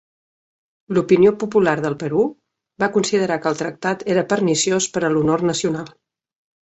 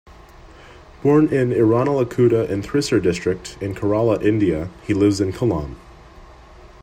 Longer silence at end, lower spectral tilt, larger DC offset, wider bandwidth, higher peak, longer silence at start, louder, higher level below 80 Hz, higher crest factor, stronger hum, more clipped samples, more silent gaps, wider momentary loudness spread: first, 0.75 s vs 0.15 s; second, -4.5 dB/octave vs -7 dB/octave; neither; second, 8.2 kHz vs 12.5 kHz; about the same, -2 dBFS vs -4 dBFS; first, 0.9 s vs 0.45 s; about the same, -19 LUFS vs -19 LUFS; second, -58 dBFS vs -44 dBFS; about the same, 18 dB vs 16 dB; neither; neither; neither; about the same, 9 LU vs 9 LU